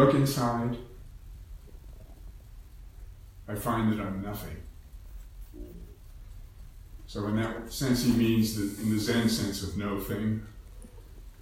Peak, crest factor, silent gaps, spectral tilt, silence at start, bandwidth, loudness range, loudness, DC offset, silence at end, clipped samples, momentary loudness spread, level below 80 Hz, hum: -8 dBFS; 22 dB; none; -5.5 dB/octave; 0 s; 17 kHz; 11 LU; -29 LUFS; under 0.1%; 0 s; under 0.1%; 25 LU; -46 dBFS; none